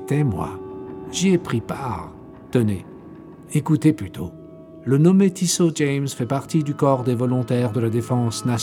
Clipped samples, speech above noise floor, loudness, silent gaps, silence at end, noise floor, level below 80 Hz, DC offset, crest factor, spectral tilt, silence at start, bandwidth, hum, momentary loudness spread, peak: under 0.1%; 21 dB; -21 LUFS; none; 0 s; -41 dBFS; -54 dBFS; under 0.1%; 16 dB; -6 dB/octave; 0 s; 17 kHz; none; 17 LU; -4 dBFS